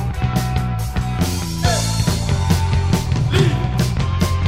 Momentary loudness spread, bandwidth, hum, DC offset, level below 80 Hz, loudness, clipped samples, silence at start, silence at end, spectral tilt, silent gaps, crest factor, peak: 4 LU; 16 kHz; none; 1%; -26 dBFS; -19 LUFS; under 0.1%; 0 s; 0 s; -5.5 dB/octave; none; 16 dB; -2 dBFS